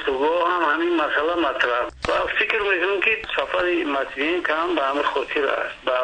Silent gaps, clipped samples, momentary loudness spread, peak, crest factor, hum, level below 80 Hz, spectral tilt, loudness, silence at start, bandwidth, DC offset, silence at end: none; under 0.1%; 4 LU; -6 dBFS; 16 dB; none; -50 dBFS; -4 dB/octave; -21 LUFS; 0 s; 9.4 kHz; under 0.1%; 0 s